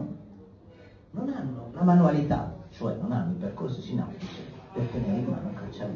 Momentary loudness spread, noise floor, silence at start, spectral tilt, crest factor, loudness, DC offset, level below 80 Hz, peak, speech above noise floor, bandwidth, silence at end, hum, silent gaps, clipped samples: 18 LU; -51 dBFS; 0 s; -9.5 dB/octave; 18 dB; -29 LUFS; under 0.1%; -52 dBFS; -10 dBFS; 24 dB; 6.6 kHz; 0 s; none; none; under 0.1%